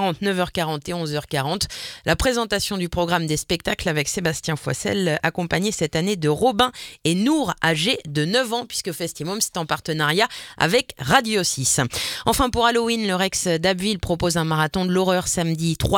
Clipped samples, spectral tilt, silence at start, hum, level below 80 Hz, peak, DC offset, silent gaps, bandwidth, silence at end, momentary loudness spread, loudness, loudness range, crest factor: under 0.1%; -4 dB/octave; 0 s; none; -42 dBFS; -2 dBFS; under 0.1%; none; 18.5 kHz; 0 s; 6 LU; -21 LUFS; 3 LU; 20 dB